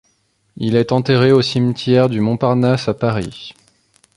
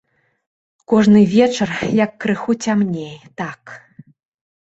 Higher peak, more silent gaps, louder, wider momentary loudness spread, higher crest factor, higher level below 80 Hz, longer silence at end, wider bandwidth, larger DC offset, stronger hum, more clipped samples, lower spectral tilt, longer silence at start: about the same, -2 dBFS vs -2 dBFS; neither; about the same, -16 LUFS vs -16 LUFS; second, 12 LU vs 17 LU; about the same, 14 dB vs 16 dB; first, -48 dBFS vs -54 dBFS; second, 0.65 s vs 0.9 s; first, 11 kHz vs 8 kHz; neither; neither; neither; about the same, -7 dB/octave vs -6 dB/octave; second, 0.55 s vs 0.9 s